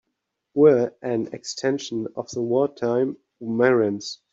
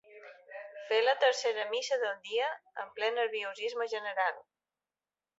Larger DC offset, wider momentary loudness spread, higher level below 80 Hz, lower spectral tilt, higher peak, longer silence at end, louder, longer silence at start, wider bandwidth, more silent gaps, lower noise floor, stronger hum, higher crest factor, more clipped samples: neither; second, 13 LU vs 19 LU; first, -68 dBFS vs -90 dBFS; first, -5.5 dB/octave vs 1 dB/octave; first, -4 dBFS vs -14 dBFS; second, 0.15 s vs 1 s; first, -23 LUFS vs -32 LUFS; first, 0.55 s vs 0.1 s; about the same, 7.8 kHz vs 8 kHz; neither; second, -79 dBFS vs under -90 dBFS; neither; about the same, 18 dB vs 20 dB; neither